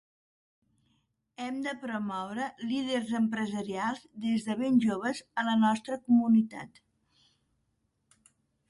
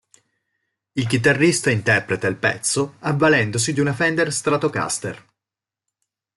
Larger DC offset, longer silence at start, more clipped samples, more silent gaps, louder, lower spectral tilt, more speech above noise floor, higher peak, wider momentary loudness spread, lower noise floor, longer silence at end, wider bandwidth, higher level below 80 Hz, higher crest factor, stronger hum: neither; first, 1.4 s vs 0.95 s; neither; neither; second, -30 LUFS vs -19 LUFS; about the same, -5.5 dB/octave vs -4.5 dB/octave; second, 47 dB vs 69 dB; second, -14 dBFS vs -4 dBFS; about the same, 10 LU vs 9 LU; second, -77 dBFS vs -88 dBFS; first, 2.05 s vs 1.2 s; about the same, 11.5 kHz vs 12 kHz; second, -74 dBFS vs -58 dBFS; about the same, 16 dB vs 18 dB; neither